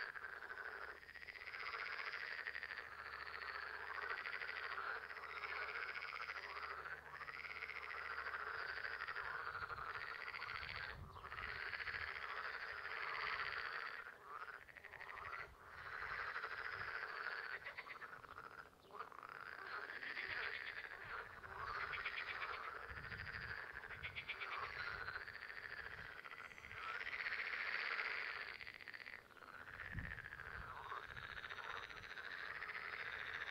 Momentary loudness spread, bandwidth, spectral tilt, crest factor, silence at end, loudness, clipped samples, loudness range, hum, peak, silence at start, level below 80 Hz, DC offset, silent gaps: 9 LU; 16 kHz; -3.5 dB/octave; 22 dB; 0 s; -48 LUFS; under 0.1%; 4 LU; none; -28 dBFS; 0 s; -70 dBFS; under 0.1%; none